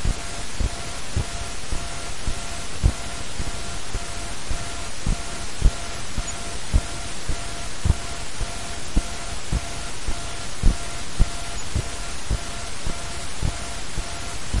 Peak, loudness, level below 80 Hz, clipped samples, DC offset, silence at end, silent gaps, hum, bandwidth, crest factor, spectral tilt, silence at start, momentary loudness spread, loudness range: -2 dBFS; -29 LUFS; -28 dBFS; under 0.1%; 4%; 0 s; none; none; 11.5 kHz; 24 dB; -3.5 dB/octave; 0 s; 6 LU; 1 LU